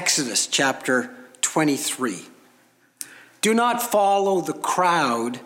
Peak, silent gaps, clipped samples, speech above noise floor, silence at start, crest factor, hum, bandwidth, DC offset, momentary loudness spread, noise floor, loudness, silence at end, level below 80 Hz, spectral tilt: -6 dBFS; none; under 0.1%; 37 dB; 0 s; 18 dB; none; 17 kHz; under 0.1%; 17 LU; -59 dBFS; -21 LUFS; 0 s; -76 dBFS; -2.5 dB/octave